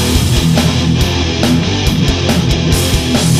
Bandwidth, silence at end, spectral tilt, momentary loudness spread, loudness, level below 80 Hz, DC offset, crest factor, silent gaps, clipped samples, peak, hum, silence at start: 15.5 kHz; 0 s; -5 dB/octave; 2 LU; -12 LUFS; -20 dBFS; under 0.1%; 12 dB; none; under 0.1%; 0 dBFS; none; 0 s